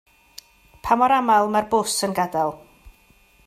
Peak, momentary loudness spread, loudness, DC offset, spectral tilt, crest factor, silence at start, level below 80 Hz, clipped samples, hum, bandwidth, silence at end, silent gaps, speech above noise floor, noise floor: -4 dBFS; 8 LU; -20 LUFS; under 0.1%; -3.5 dB/octave; 18 dB; 0.85 s; -52 dBFS; under 0.1%; none; 15.5 kHz; 0.55 s; none; 36 dB; -56 dBFS